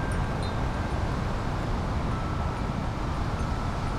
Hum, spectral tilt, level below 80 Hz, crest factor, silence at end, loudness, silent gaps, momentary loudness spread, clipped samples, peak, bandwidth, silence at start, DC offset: none; -6.5 dB/octave; -32 dBFS; 12 dB; 0 s; -30 LUFS; none; 1 LU; under 0.1%; -16 dBFS; 12.5 kHz; 0 s; under 0.1%